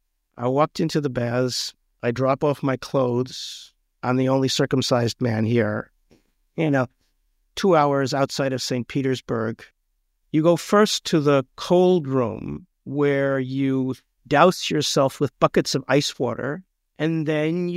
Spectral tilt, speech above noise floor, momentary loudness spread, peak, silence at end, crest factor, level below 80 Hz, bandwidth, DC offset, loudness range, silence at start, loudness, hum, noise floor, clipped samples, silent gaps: -5.5 dB/octave; 50 dB; 12 LU; -2 dBFS; 0 s; 20 dB; -58 dBFS; 16 kHz; under 0.1%; 3 LU; 0.35 s; -22 LUFS; none; -71 dBFS; under 0.1%; none